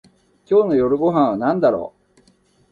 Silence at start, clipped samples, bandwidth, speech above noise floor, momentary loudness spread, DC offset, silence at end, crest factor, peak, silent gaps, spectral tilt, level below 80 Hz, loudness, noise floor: 0.5 s; under 0.1%; 6.8 kHz; 41 dB; 6 LU; under 0.1%; 0.85 s; 16 dB; -4 dBFS; none; -9 dB/octave; -54 dBFS; -18 LUFS; -57 dBFS